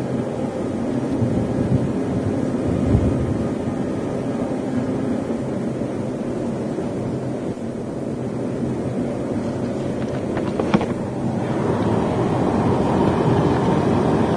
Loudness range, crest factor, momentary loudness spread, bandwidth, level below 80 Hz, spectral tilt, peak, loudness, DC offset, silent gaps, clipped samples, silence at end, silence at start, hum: 5 LU; 18 dB; 7 LU; 10.5 kHz; -38 dBFS; -8 dB/octave; -2 dBFS; -22 LUFS; under 0.1%; none; under 0.1%; 0 s; 0 s; none